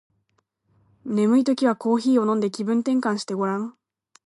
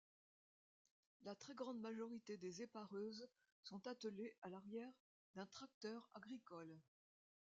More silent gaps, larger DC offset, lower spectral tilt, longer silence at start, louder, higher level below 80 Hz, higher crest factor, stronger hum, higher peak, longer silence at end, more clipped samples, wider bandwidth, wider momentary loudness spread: second, none vs 3.52-3.63 s, 4.38-4.42 s, 5.00-5.34 s, 5.74-5.81 s; neither; first, -6 dB/octave vs -4.5 dB/octave; second, 1.05 s vs 1.2 s; first, -22 LUFS vs -55 LUFS; first, -76 dBFS vs under -90 dBFS; about the same, 14 dB vs 18 dB; neither; first, -8 dBFS vs -38 dBFS; second, 0.6 s vs 0.75 s; neither; first, 11.5 kHz vs 7.6 kHz; about the same, 9 LU vs 10 LU